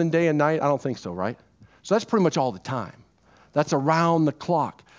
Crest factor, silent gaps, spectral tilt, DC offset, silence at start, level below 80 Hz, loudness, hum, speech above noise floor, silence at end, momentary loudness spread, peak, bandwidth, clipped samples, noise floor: 18 dB; none; -6.5 dB/octave; under 0.1%; 0 s; -62 dBFS; -24 LUFS; none; 34 dB; 0.25 s; 11 LU; -6 dBFS; 7.8 kHz; under 0.1%; -57 dBFS